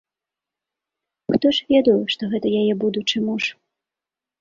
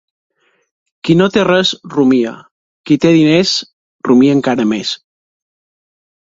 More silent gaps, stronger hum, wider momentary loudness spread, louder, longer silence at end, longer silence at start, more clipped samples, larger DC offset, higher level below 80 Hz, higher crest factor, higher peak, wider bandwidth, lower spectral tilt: second, none vs 2.51-2.84 s, 3.73-3.99 s; neither; second, 8 LU vs 12 LU; second, -20 LUFS vs -12 LUFS; second, 0.9 s vs 1.35 s; first, 1.3 s vs 1.05 s; neither; neither; second, -60 dBFS vs -54 dBFS; about the same, 18 dB vs 14 dB; second, -4 dBFS vs 0 dBFS; about the same, 7.6 kHz vs 7.8 kHz; about the same, -5.5 dB/octave vs -5.5 dB/octave